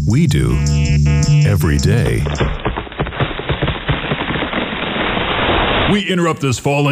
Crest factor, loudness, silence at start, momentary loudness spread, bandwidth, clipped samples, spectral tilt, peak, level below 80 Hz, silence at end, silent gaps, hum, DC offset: 12 dB; -16 LUFS; 0 s; 7 LU; 15 kHz; under 0.1%; -5.5 dB/octave; -4 dBFS; -24 dBFS; 0 s; none; none; under 0.1%